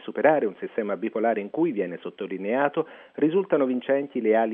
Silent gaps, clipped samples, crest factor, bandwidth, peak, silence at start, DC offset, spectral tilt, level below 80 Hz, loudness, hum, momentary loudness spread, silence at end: none; under 0.1%; 20 dB; 3.8 kHz; -6 dBFS; 0 s; under 0.1%; -5 dB/octave; -84 dBFS; -25 LUFS; none; 10 LU; 0 s